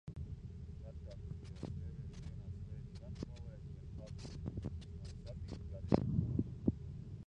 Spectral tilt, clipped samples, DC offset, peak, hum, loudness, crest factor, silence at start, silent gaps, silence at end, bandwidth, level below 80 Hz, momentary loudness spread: -8.5 dB/octave; under 0.1%; under 0.1%; -14 dBFS; none; -44 LUFS; 30 dB; 0.05 s; none; 0.05 s; 9.8 kHz; -50 dBFS; 14 LU